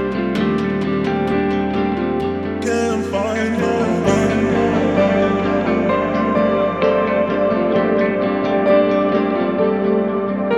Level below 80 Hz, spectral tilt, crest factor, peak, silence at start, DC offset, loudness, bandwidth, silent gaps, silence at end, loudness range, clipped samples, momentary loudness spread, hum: -42 dBFS; -6.5 dB/octave; 14 dB; -2 dBFS; 0 s; under 0.1%; -17 LUFS; 11 kHz; none; 0 s; 3 LU; under 0.1%; 4 LU; none